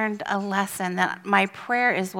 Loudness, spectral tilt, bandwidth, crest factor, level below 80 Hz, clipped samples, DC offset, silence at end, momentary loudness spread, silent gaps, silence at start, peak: -24 LUFS; -4.5 dB/octave; 18 kHz; 20 dB; -70 dBFS; under 0.1%; under 0.1%; 0 s; 5 LU; none; 0 s; -4 dBFS